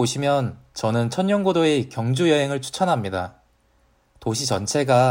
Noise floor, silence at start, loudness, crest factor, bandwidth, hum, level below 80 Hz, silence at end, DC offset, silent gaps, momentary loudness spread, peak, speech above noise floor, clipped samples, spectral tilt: -61 dBFS; 0 s; -22 LUFS; 18 dB; 16.5 kHz; none; -58 dBFS; 0 s; under 0.1%; none; 9 LU; -4 dBFS; 41 dB; under 0.1%; -5 dB/octave